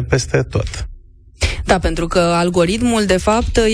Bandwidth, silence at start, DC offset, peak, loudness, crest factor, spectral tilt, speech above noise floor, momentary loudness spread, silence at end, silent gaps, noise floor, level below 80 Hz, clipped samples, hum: 13.5 kHz; 0 s; under 0.1%; -2 dBFS; -16 LUFS; 14 dB; -5 dB/octave; 25 dB; 7 LU; 0 s; none; -40 dBFS; -26 dBFS; under 0.1%; none